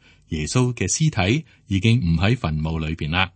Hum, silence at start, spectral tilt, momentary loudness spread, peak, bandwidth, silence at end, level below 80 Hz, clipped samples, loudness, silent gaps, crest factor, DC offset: none; 0.3 s; -5 dB/octave; 7 LU; -2 dBFS; 8.8 kHz; 0.05 s; -38 dBFS; under 0.1%; -21 LUFS; none; 20 dB; under 0.1%